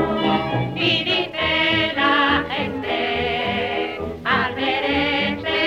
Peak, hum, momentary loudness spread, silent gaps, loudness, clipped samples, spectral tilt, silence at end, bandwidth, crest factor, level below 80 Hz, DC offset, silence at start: -6 dBFS; none; 7 LU; none; -20 LUFS; under 0.1%; -6 dB/octave; 0 s; 15.5 kHz; 14 dB; -44 dBFS; under 0.1%; 0 s